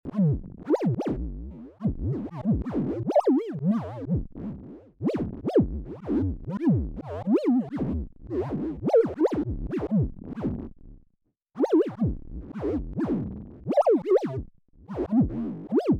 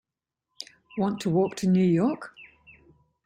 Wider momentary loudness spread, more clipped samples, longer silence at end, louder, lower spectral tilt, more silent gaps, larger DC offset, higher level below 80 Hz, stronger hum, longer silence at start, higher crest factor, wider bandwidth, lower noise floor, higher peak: second, 15 LU vs 21 LU; neither; second, 0 s vs 0.8 s; about the same, -27 LUFS vs -25 LUFS; first, -10 dB/octave vs -7.5 dB/octave; neither; neither; first, -40 dBFS vs -64 dBFS; neither; second, 0.05 s vs 0.6 s; about the same, 14 dB vs 16 dB; second, 9.4 kHz vs 10.5 kHz; second, -70 dBFS vs -86 dBFS; about the same, -12 dBFS vs -12 dBFS